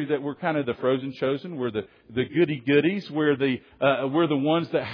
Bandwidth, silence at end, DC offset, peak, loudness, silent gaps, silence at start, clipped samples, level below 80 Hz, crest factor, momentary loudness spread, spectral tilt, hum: 5.4 kHz; 0 s; under 0.1%; -8 dBFS; -25 LUFS; none; 0 s; under 0.1%; -66 dBFS; 18 dB; 8 LU; -8.5 dB/octave; none